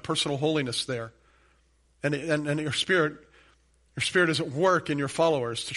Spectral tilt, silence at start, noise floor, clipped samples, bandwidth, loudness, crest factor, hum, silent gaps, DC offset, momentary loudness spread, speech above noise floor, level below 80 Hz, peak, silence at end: -4.5 dB/octave; 0.05 s; -65 dBFS; under 0.1%; 11.5 kHz; -26 LUFS; 18 dB; none; none; under 0.1%; 9 LU; 38 dB; -62 dBFS; -10 dBFS; 0 s